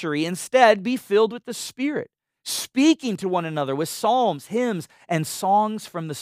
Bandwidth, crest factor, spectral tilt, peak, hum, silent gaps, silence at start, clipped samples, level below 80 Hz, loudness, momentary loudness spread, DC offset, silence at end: 16 kHz; 20 dB; -4.5 dB/octave; -2 dBFS; none; none; 0 s; under 0.1%; -74 dBFS; -22 LUFS; 14 LU; under 0.1%; 0 s